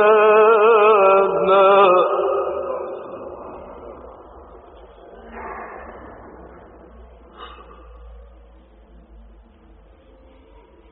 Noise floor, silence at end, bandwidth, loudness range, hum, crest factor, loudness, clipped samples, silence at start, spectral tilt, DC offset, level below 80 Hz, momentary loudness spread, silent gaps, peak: -48 dBFS; 2.85 s; 4 kHz; 24 LU; none; 16 dB; -14 LUFS; under 0.1%; 0 s; -2.5 dB/octave; under 0.1%; -48 dBFS; 27 LU; none; -2 dBFS